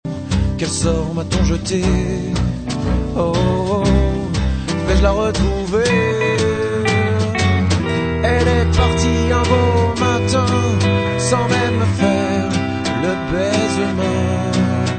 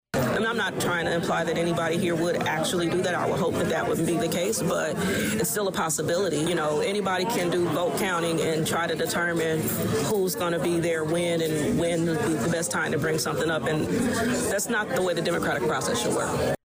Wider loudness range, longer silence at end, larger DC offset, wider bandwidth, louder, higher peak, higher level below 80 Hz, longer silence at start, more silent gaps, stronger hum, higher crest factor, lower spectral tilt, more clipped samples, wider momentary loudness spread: first, 3 LU vs 0 LU; about the same, 0 s vs 0.1 s; neither; second, 9.2 kHz vs 16 kHz; first, -17 LUFS vs -25 LUFS; first, 0 dBFS vs -16 dBFS; first, -26 dBFS vs -54 dBFS; about the same, 0.05 s vs 0.15 s; neither; neither; first, 16 dB vs 10 dB; about the same, -5.5 dB/octave vs -4.5 dB/octave; neither; first, 5 LU vs 1 LU